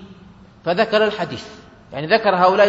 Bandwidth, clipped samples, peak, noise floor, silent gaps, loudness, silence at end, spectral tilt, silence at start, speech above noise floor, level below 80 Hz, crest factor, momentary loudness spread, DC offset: 8 kHz; under 0.1%; -2 dBFS; -45 dBFS; none; -18 LUFS; 0 s; -5.5 dB/octave; 0 s; 28 dB; -56 dBFS; 18 dB; 18 LU; under 0.1%